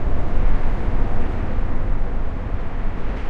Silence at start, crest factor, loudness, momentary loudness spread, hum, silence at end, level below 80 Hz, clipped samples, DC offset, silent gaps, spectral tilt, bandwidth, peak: 0 s; 12 dB; -27 LUFS; 4 LU; none; 0 s; -20 dBFS; under 0.1%; under 0.1%; none; -8.5 dB/octave; 3.5 kHz; -4 dBFS